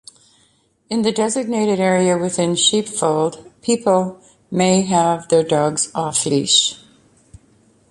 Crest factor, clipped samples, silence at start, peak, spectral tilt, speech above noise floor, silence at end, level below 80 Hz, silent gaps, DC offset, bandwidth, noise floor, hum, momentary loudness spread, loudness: 16 dB; under 0.1%; 0.9 s; -2 dBFS; -3.5 dB/octave; 42 dB; 1.15 s; -58 dBFS; none; under 0.1%; 11.5 kHz; -59 dBFS; none; 7 LU; -17 LUFS